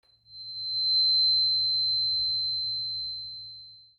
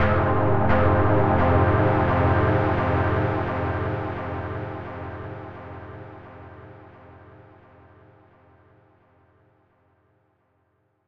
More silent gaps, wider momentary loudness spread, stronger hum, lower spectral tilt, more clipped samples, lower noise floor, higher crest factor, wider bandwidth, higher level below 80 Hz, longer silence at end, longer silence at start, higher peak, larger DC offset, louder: neither; second, 18 LU vs 21 LU; neither; second, -3 dB/octave vs -10 dB/octave; neither; second, -48 dBFS vs -68 dBFS; second, 10 dB vs 18 dB; second, 4.4 kHz vs 5.4 kHz; second, -64 dBFS vs -40 dBFS; first, 0.2 s vs 0 s; first, 0.3 s vs 0 s; second, -18 dBFS vs -6 dBFS; neither; about the same, -23 LUFS vs -22 LUFS